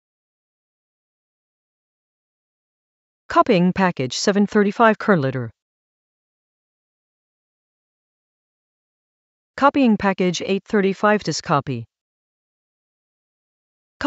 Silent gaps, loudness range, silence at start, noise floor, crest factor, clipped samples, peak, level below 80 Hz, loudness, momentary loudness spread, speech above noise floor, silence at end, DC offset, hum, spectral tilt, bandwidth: 5.62-9.54 s, 12.01-14.00 s; 6 LU; 3.3 s; under -90 dBFS; 22 dB; under 0.1%; -2 dBFS; -58 dBFS; -18 LUFS; 9 LU; over 72 dB; 0 s; under 0.1%; none; -5.5 dB/octave; 8 kHz